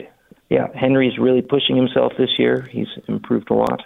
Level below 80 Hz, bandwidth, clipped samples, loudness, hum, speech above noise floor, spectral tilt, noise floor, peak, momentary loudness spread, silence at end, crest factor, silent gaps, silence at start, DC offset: -54 dBFS; 5.4 kHz; under 0.1%; -18 LUFS; none; 28 dB; -8 dB/octave; -46 dBFS; -2 dBFS; 9 LU; 0 s; 16 dB; none; 0 s; under 0.1%